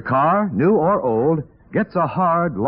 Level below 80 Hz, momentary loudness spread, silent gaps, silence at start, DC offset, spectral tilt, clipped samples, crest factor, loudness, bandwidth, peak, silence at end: -52 dBFS; 7 LU; none; 0 s; under 0.1%; -8 dB/octave; under 0.1%; 10 dB; -18 LUFS; 5.4 kHz; -8 dBFS; 0 s